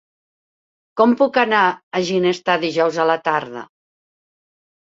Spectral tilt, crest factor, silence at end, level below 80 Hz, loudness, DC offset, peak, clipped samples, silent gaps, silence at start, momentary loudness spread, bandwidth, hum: -5 dB/octave; 20 dB; 1.25 s; -66 dBFS; -18 LUFS; under 0.1%; 0 dBFS; under 0.1%; 1.83-1.91 s; 0.95 s; 9 LU; 7.8 kHz; none